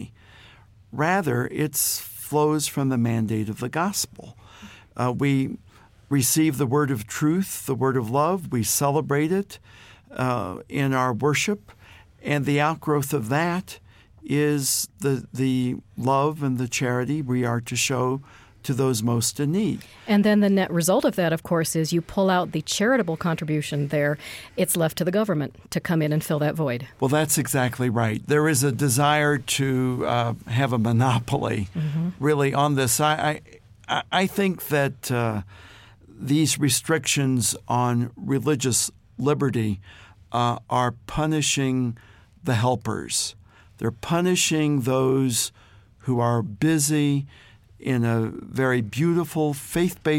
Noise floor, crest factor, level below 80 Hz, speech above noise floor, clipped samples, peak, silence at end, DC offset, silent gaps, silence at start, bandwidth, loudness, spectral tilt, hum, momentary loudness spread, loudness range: -51 dBFS; 16 dB; -54 dBFS; 28 dB; under 0.1%; -8 dBFS; 0 s; under 0.1%; none; 0 s; 17 kHz; -23 LUFS; -5 dB/octave; none; 8 LU; 3 LU